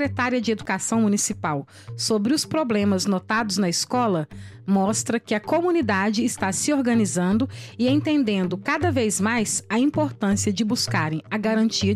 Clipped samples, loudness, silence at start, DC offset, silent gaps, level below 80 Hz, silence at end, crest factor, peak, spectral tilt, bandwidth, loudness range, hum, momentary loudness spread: under 0.1%; -22 LUFS; 0 s; under 0.1%; none; -58 dBFS; 0 s; 14 dB; -8 dBFS; -4.5 dB/octave; 14.5 kHz; 1 LU; none; 4 LU